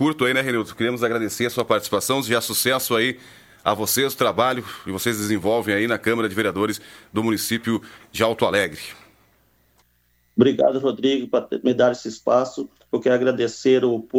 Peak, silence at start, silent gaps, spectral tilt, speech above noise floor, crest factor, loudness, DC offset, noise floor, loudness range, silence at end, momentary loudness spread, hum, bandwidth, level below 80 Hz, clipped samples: -2 dBFS; 0 s; none; -4 dB/octave; 42 dB; 20 dB; -21 LUFS; under 0.1%; -63 dBFS; 3 LU; 0 s; 8 LU; none; 17 kHz; -60 dBFS; under 0.1%